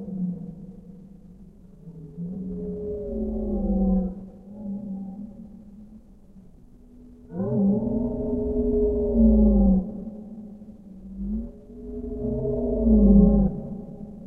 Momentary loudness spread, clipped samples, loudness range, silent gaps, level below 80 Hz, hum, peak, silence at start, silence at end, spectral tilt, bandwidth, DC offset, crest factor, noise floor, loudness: 24 LU; under 0.1%; 12 LU; none; -32 dBFS; none; -6 dBFS; 0 s; 0 s; -14 dB/octave; 1.5 kHz; under 0.1%; 20 dB; -49 dBFS; -24 LUFS